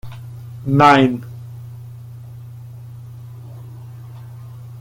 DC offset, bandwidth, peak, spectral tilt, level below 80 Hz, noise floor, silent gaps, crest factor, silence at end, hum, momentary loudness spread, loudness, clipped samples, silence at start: under 0.1%; 16.5 kHz; 0 dBFS; -7 dB/octave; -52 dBFS; -35 dBFS; none; 20 dB; 0 s; none; 25 LU; -14 LUFS; under 0.1%; 0.05 s